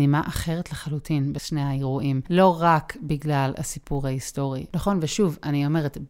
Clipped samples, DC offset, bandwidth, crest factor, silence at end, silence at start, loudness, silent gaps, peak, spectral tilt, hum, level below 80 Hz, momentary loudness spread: under 0.1%; under 0.1%; 16 kHz; 18 dB; 0 s; 0 s; -24 LUFS; none; -6 dBFS; -6 dB/octave; none; -44 dBFS; 10 LU